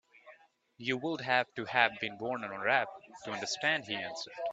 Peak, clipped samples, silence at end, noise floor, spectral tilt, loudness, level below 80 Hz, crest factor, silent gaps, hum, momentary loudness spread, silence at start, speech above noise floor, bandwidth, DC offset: -8 dBFS; under 0.1%; 0 s; -62 dBFS; -3 dB/octave; -33 LUFS; -78 dBFS; 26 dB; none; none; 11 LU; 0.25 s; 28 dB; 9 kHz; under 0.1%